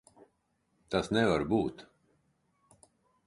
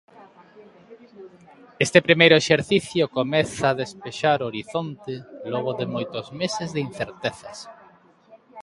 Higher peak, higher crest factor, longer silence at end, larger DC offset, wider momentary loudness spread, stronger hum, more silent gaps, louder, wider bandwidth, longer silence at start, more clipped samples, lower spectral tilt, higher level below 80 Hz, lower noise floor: second, -14 dBFS vs 0 dBFS; about the same, 22 dB vs 24 dB; first, 1.45 s vs 0 s; neither; second, 7 LU vs 20 LU; neither; neither; second, -30 LUFS vs -22 LUFS; about the same, 11.5 kHz vs 11.5 kHz; first, 0.9 s vs 0.2 s; neither; first, -6 dB/octave vs -4.5 dB/octave; about the same, -58 dBFS vs -60 dBFS; first, -76 dBFS vs -54 dBFS